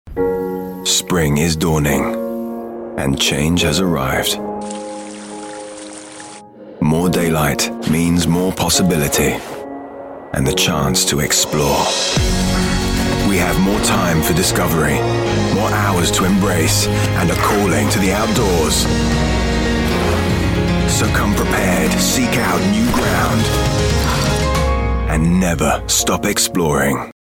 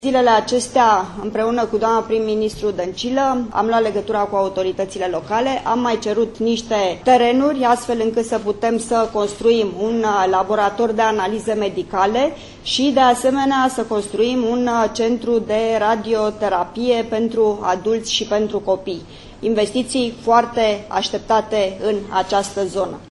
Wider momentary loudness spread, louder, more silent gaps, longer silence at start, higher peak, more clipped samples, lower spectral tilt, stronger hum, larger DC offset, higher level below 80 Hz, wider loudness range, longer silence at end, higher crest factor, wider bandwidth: first, 11 LU vs 7 LU; about the same, -16 LUFS vs -18 LUFS; neither; about the same, 0.05 s vs 0 s; about the same, -4 dBFS vs -2 dBFS; neither; about the same, -4 dB/octave vs -4 dB/octave; neither; neither; first, -28 dBFS vs -46 dBFS; about the same, 4 LU vs 2 LU; first, 0.15 s vs 0 s; about the same, 12 dB vs 16 dB; first, 17 kHz vs 11.5 kHz